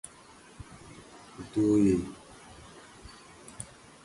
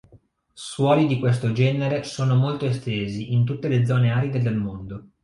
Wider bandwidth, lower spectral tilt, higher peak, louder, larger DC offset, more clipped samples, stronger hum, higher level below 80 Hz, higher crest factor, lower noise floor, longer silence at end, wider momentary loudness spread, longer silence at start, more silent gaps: about the same, 11.5 kHz vs 11 kHz; about the same, -6.5 dB/octave vs -7.5 dB/octave; second, -14 dBFS vs -6 dBFS; second, -27 LUFS vs -22 LUFS; neither; neither; neither; about the same, -56 dBFS vs -54 dBFS; about the same, 20 dB vs 16 dB; about the same, -54 dBFS vs -55 dBFS; first, 0.4 s vs 0.2 s; first, 25 LU vs 10 LU; first, 0.6 s vs 0.15 s; neither